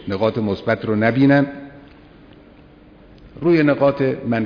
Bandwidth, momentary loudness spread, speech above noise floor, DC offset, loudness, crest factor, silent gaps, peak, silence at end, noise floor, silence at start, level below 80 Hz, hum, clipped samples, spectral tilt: 5.4 kHz; 8 LU; 29 dB; under 0.1%; -18 LUFS; 18 dB; none; -2 dBFS; 0 s; -46 dBFS; 0 s; -50 dBFS; none; under 0.1%; -9.5 dB/octave